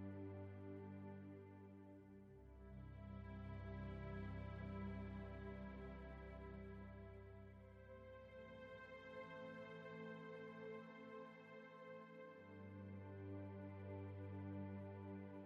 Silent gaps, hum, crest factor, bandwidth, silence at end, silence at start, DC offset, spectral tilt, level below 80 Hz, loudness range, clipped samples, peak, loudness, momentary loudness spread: none; none; 14 dB; 6 kHz; 0 s; 0 s; under 0.1%; -7 dB/octave; -64 dBFS; 5 LU; under 0.1%; -40 dBFS; -55 LUFS; 9 LU